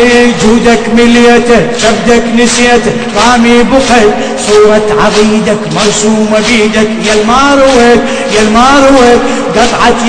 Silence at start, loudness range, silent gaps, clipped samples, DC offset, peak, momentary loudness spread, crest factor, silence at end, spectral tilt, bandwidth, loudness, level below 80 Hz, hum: 0 s; 1 LU; none; 10%; under 0.1%; 0 dBFS; 5 LU; 6 dB; 0 s; -3.5 dB/octave; 11 kHz; -6 LUFS; -26 dBFS; none